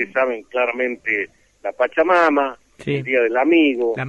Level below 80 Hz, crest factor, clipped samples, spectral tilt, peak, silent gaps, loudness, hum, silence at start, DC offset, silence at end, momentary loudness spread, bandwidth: -60 dBFS; 14 dB; under 0.1%; -6.5 dB/octave; -4 dBFS; none; -18 LUFS; none; 0 s; under 0.1%; 0 s; 13 LU; 8.4 kHz